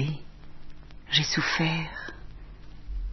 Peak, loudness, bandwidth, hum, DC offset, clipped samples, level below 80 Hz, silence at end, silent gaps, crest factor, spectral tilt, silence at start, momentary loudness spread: -10 dBFS; -27 LUFS; 6.2 kHz; none; under 0.1%; under 0.1%; -42 dBFS; 0 s; none; 22 dB; -3.5 dB/octave; 0 s; 25 LU